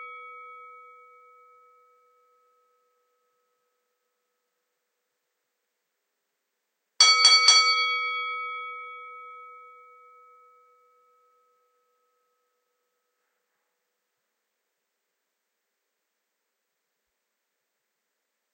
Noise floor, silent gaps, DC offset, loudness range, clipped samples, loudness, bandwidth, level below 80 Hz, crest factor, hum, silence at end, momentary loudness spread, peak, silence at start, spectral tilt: -81 dBFS; none; under 0.1%; 17 LU; under 0.1%; -18 LUFS; 9.6 kHz; under -90 dBFS; 26 dB; none; 9.1 s; 29 LU; -4 dBFS; 0 s; 6.5 dB/octave